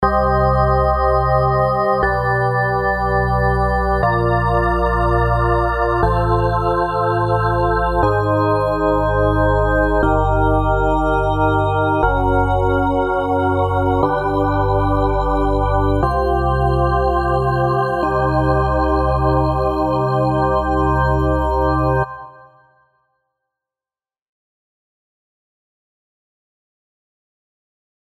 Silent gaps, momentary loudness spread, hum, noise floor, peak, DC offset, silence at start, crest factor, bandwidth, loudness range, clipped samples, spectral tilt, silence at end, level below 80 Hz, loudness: none; 2 LU; none; under -90 dBFS; -2 dBFS; under 0.1%; 0 s; 16 dB; 10 kHz; 2 LU; under 0.1%; -8.5 dB/octave; 5.75 s; -26 dBFS; -17 LUFS